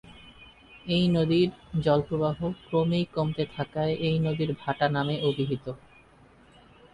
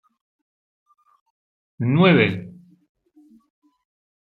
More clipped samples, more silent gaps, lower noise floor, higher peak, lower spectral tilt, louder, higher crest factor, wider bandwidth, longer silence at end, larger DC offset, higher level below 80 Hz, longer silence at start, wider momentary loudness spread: neither; neither; about the same, -56 dBFS vs -54 dBFS; second, -10 dBFS vs -2 dBFS; second, -8 dB/octave vs -9.5 dB/octave; second, -27 LUFS vs -18 LUFS; about the same, 18 dB vs 22 dB; first, 10.5 kHz vs 4.7 kHz; second, 1.2 s vs 1.7 s; neither; first, -54 dBFS vs -64 dBFS; second, 0.05 s vs 1.8 s; second, 7 LU vs 19 LU